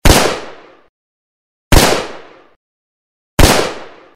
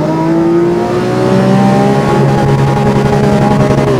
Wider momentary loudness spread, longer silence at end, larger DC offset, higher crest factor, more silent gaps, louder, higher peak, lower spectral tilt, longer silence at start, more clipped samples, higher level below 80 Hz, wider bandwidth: first, 18 LU vs 3 LU; first, 0.3 s vs 0 s; second, under 0.1% vs 0.3%; first, 14 dB vs 8 dB; first, 0.89-1.71 s, 2.56-3.37 s vs none; about the same, -12 LUFS vs -10 LUFS; about the same, 0 dBFS vs 0 dBFS; second, -3.5 dB/octave vs -7.5 dB/octave; about the same, 0.05 s vs 0 s; first, 0.4% vs under 0.1%; first, -20 dBFS vs -30 dBFS; first, 16.5 kHz vs 12.5 kHz